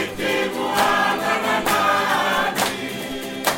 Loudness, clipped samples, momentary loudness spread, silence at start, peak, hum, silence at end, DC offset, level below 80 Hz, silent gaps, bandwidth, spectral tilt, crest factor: -20 LUFS; under 0.1%; 9 LU; 0 s; -4 dBFS; none; 0 s; under 0.1%; -50 dBFS; none; 17 kHz; -2.5 dB/octave; 16 dB